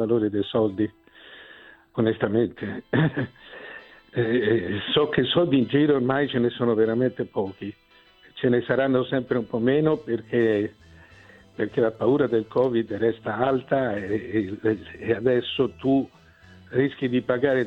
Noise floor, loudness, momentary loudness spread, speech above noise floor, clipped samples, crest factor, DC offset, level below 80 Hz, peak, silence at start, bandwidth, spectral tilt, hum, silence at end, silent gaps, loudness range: -55 dBFS; -24 LUFS; 12 LU; 31 dB; under 0.1%; 16 dB; under 0.1%; -58 dBFS; -8 dBFS; 0 s; 5 kHz; -8.5 dB/octave; none; 0 s; none; 3 LU